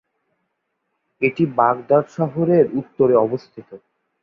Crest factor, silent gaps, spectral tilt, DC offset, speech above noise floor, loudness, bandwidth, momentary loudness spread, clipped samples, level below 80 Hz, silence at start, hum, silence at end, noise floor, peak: 18 dB; none; -9.5 dB/octave; under 0.1%; 56 dB; -18 LUFS; 7.2 kHz; 7 LU; under 0.1%; -62 dBFS; 1.2 s; none; 0.45 s; -74 dBFS; -2 dBFS